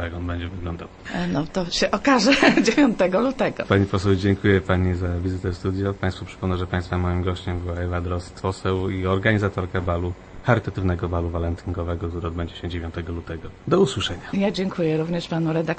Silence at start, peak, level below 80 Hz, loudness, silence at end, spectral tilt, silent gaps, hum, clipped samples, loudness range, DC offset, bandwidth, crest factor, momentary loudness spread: 0 s; -2 dBFS; -40 dBFS; -23 LUFS; 0 s; -6 dB/octave; none; none; under 0.1%; 7 LU; under 0.1%; 8.8 kHz; 20 dB; 11 LU